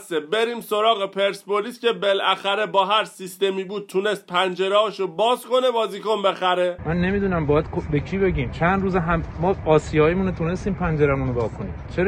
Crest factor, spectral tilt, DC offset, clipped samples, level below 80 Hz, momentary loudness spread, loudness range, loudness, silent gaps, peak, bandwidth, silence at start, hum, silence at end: 16 dB; -6 dB/octave; under 0.1%; under 0.1%; -38 dBFS; 6 LU; 1 LU; -22 LUFS; none; -4 dBFS; 16 kHz; 0 s; none; 0 s